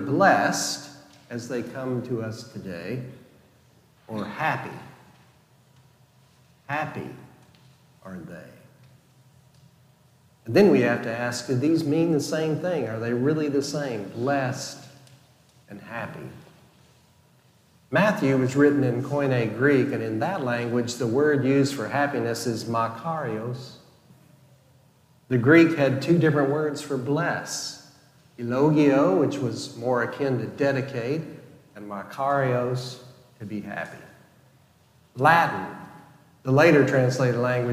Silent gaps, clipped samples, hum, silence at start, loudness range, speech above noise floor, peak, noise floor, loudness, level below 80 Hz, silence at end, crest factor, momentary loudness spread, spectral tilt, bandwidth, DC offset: none; under 0.1%; none; 0 s; 12 LU; 36 dB; -4 dBFS; -59 dBFS; -24 LUFS; -68 dBFS; 0 s; 22 dB; 19 LU; -6 dB/octave; 15.5 kHz; under 0.1%